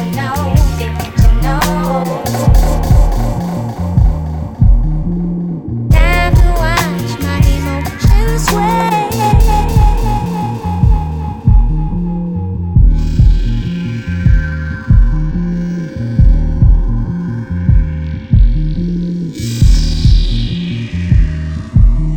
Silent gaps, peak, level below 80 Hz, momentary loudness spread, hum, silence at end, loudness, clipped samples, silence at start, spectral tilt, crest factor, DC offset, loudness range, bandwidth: none; 0 dBFS; -14 dBFS; 7 LU; none; 0 s; -14 LUFS; under 0.1%; 0 s; -6.5 dB/octave; 12 dB; 0.6%; 2 LU; 18 kHz